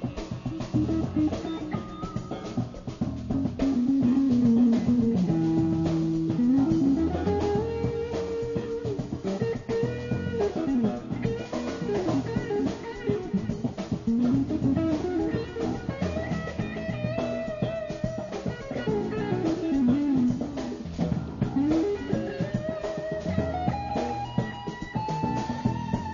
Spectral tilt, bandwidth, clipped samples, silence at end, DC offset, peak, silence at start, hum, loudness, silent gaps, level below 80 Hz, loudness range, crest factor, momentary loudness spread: -8 dB/octave; 7.4 kHz; under 0.1%; 0 s; under 0.1%; -12 dBFS; 0 s; none; -28 LUFS; none; -46 dBFS; 6 LU; 14 dB; 9 LU